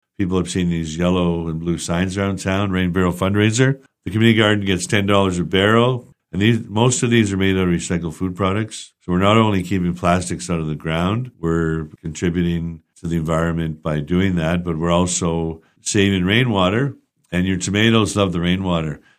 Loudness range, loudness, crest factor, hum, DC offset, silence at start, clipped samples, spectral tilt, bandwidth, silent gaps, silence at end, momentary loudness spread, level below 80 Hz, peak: 5 LU; -19 LUFS; 18 dB; none; under 0.1%; 0.2 s; under 0.1%; -5.5 dB/octave; 13.5 kHz; none; 0.2 s; 9 LU; -42 dBFS; 0 dBFS